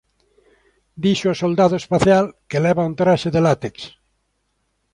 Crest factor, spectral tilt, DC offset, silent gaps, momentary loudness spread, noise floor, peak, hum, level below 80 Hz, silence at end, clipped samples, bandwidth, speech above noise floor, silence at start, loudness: 18 dB; -6.5 dB/octave; under 0.1%; none; 8 LU; -69 dBFS; -2 dBFS; none; -50 dBFS; 1.05 s; under 0.1%; 11 kHz; 52 dB; 0.95 s; -18 LUFS